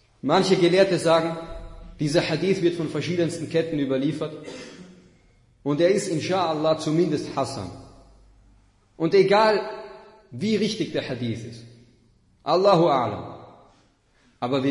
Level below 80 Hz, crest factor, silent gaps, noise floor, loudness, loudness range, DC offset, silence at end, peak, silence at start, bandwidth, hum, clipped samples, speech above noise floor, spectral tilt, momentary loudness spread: -54 dBFS; 18 dB; none; -61 dBFS; -23 LUFS; 4 LU; under 0.1%; 0 s; -6 dBFS; 0.25 s; 11 kHz; none; under 0.1%; 39 dB; -5.5 dB/octave; 20 LU